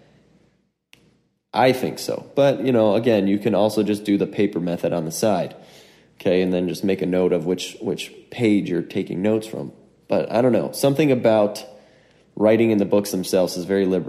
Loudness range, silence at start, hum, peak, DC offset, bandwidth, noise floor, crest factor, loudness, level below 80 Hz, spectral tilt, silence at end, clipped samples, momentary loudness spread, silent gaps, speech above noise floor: 3 LU; 1.55 s; none; -4 dBFS; under 0.1%; 15.5 kHz; -64 dBFS; 18 dB; -21 LUFS; -62 dBFS; -6 dB/octave; 0 s; under 0.1%; 9 LU; none; 44 dB